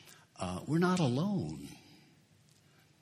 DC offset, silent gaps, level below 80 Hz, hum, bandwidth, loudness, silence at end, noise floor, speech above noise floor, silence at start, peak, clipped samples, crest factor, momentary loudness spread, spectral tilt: under 0.1%; none; -66 dBFS; none; 13.5 kHz; -33 LUFS; 1.25 s; -65 dBFS; 33 dB; 0.05 s; -16 dBFS; under 0.1%; 20 dB; 22 LU; -6.5 dB/octave